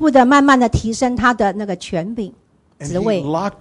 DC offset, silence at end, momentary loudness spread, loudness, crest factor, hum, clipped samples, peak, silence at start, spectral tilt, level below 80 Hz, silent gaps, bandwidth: under 0.1%; 0.1 s; 15 LU; -16 LUFS; 14 dB; none; under 0.1%; -2 dBFS; 0 s; -5.5 dB/octave; -36 dBFS; none; 11.5 kHz